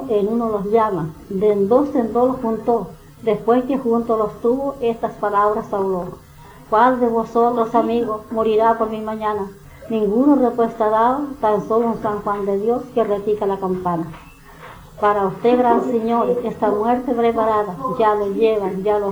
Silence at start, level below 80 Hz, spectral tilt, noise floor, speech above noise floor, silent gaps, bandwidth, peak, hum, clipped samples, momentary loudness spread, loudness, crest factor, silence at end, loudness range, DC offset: 0 s; -48 dBFS; -7.5 dB/octave; -40 dBFS; 22 dB; none; over 20 kHz; -2 dBFS; none; under 0.1%; 7 LU; -19 LUFS; 16 dB; 0 s; 2 LU; under 0.1%